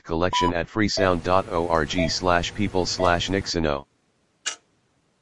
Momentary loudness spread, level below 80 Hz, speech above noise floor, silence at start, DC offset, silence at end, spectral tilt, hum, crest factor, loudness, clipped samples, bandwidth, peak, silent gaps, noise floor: 11 LU; -44 dBFS; 44 dB; 0 s; 0.8%; 0 s; -4.5 dB/octave; none; 20 dB; -23 LUFS; under 0.1%; 11.5 kHz; -4 dBFS; none; -67 dBFS